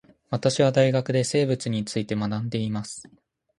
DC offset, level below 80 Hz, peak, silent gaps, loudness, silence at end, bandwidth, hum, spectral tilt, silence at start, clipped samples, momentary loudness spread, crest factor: under 0.1%; -60 dBFS; -4 dBFS; none; -24 LUFS; 0.55 s; 11.5 kHz; none; -5.5 dB/octave; 0.3 s; under 0.1%; 12 LU; 20 dB